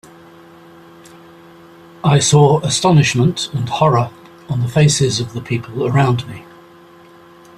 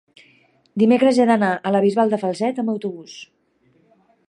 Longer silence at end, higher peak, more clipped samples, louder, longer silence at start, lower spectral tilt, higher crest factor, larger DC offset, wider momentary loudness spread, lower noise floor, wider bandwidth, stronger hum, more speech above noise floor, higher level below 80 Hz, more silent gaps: about the same, 1.15 s vs 1.05 s; about the same, -2 dBFS vs -4 dBFS; neither; first, -15 LUFS vs -18 LUFS; first, 2.05 s vs 0.75 s; second, -5 dB/octave vs -6.5 dB/octave; about the same, 16 dB vs 16 dB; neither; second, 11 LU vs 18 LU; second, -43 dBFS vs -60 dBFS; first, 13 kHz vs 11 kHz; neither; second, 29 dB vs 42 dB; first, -48 dBFS vs -72 dBFS; neither